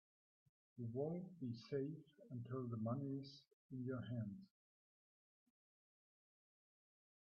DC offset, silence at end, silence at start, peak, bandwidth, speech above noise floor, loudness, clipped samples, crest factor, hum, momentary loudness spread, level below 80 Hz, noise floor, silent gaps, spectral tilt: under 0.1%; 2.8 s; 0.75 s; -32 dBFS; 6.4 kHz; over 43 dB; -49 LUFS; under 0.1%; 20 dB; none; 13 LU; -88 dBFS; under -90 dBFS; 3.53-3.69 s; -8.5 dB/octave